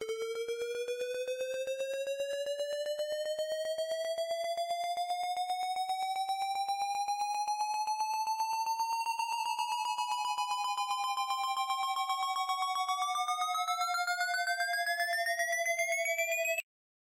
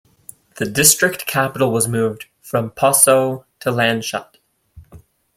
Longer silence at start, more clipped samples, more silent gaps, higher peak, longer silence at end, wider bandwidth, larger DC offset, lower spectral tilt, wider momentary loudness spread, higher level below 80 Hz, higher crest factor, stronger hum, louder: second, 0 s vs 0.6 s; neither; neither; second, -24 dBFS vs 0 dBFS; about the same, 0.4 s vs 0.4 s; about the same, 16.5 kHz vs 16.5 kHz; neither; second, 2.5 dB/octave vs -3 dB/octave; second, 5 LU vs 13 LU; second, -84 dBFS vs -54 dBFS; second, 10 dB vs 18 dB; neither; second, -33 LUFS vs -16 LUFS